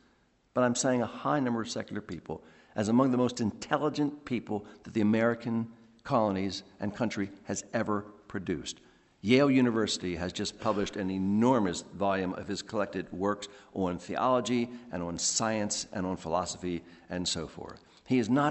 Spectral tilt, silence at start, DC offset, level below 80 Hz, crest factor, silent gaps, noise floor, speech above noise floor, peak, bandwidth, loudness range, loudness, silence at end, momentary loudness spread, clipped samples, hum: -4.5 dB/octave; 0.55 s; under 0.1%; -64 dBFS; 20 dB; none; -67 dBFS; 37 dB; -12 dBFS; 8.4 kHz; 4 LU; -31 LUFS; 0 s; 13 LU; under 0.1%; none